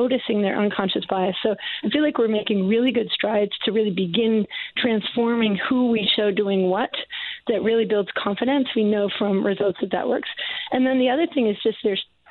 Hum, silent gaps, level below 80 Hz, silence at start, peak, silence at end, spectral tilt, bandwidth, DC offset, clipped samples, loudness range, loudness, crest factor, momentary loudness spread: none; none; -62 dBFS; 0 s; -8 dBFS; 0.25 s; -9 dB/octave; 4.5 kHz; under 0.1%; under 0.1%; 1 LU; -22 LUFS; 14 dB; 5 LU